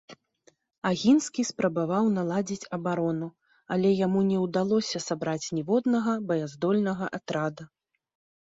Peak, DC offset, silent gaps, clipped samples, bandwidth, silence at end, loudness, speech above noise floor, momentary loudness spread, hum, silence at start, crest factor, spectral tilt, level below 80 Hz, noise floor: -10 dBFS; under 0.1%; 0.78-0.82 s; under 0.1%; 8 kHz; 0.8 s; -27 LUFS; 38 dB; 8 LU; none; 0.1 s; 16 dB; -5.5 dB/octave; -68 dBFS; -65 dBFS